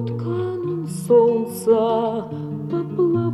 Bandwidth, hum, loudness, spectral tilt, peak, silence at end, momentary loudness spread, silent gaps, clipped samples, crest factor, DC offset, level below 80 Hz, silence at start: 13.5 kHz; none; -21 LUFS; -8 dB/octave; -6 dBFS; 0 s; 11 LU; none; under 0.1%; 14 dB; under 0.1%; -62 dBFS; 0 s